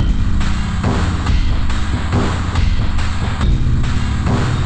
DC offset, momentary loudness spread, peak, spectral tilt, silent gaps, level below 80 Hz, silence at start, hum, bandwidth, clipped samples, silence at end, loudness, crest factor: under 0.1%; 3 LU; -4 dBFS; -6.5 dB/octave; none; -18 dBFS; 0 s; none; 9.2 kHz; under 0.1%; 0 s; -18 LUFS; 10 dB